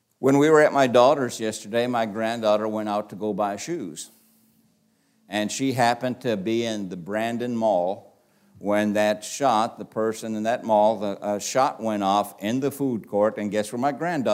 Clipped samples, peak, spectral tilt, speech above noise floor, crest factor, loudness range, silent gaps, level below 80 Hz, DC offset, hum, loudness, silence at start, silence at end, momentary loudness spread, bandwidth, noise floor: under 0.1%; -4 dBFS; -5 dB/octave; 42 dB; 20 dB; 6 LU; none; -74 dBFS; under 0.1%; none; -23 LUFS; 0.2 s; 0 s; 12 LU; 16 kHz; -65 dBFS